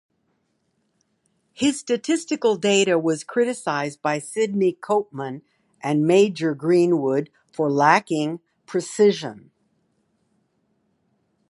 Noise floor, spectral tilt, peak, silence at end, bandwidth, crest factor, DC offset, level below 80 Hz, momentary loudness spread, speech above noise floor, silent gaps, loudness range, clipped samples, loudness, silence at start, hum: -70 dBFS; -5 dB/octave; 0 dBFS; 2.1 s; 11.5 kHz; 22 dB; under 0.1%; -70 dBFS; 13 LU; 50 dB; none; 4 LU; under 0.1%; -21 LUFS; 1.6 s; none